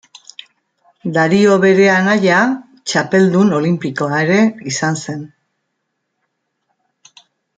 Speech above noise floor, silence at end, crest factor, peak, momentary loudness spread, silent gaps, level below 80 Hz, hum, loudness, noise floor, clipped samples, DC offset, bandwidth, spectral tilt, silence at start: 59 dB; 2.3 s; 14 dB; 0 dBFS; 14 LU; none; -60 dBFS; none; -14 LUFS; -72 dBFS; under 0.1%; under 0.1%; 9.2 kHz; -5.5 dB/octave; 1.05 s